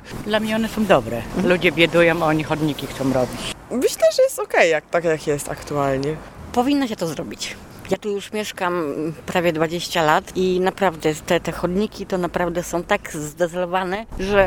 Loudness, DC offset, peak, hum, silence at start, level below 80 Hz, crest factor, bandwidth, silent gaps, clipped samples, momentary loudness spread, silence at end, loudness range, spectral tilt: -21 LUFS; under 0.1%; 0 dBFS; none; 0 s; -44 dBFS; 20 dB; 19 kHz; none; under 0.1%; 10 LU; 0 s; 5 LU; -5 dB/octave